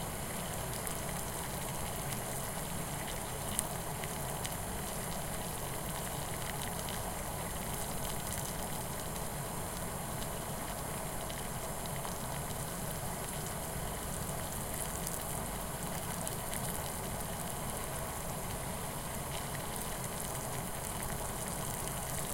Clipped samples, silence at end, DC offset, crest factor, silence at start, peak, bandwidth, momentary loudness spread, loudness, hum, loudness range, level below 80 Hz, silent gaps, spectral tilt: under 0.1%; 0 s; under 0.1%; 30 dB; 0 s; -8 dBFS; 17 kHz; 2 LU; -38 LUFS; none; 1 LU; -48 dBFS; none; -3.5 dB/octave